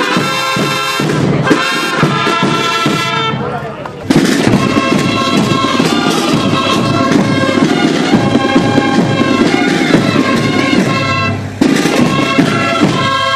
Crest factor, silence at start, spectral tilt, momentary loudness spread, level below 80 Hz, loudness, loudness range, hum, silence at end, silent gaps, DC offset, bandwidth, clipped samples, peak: 12 dB; 0 s; -5 dB/octave; 3 LU; -42 dBFS; -11 LUFS; 2 LU; none; 0 s; none; under 0.1%; 14.5 kHz; 0.3%; 0 dBFS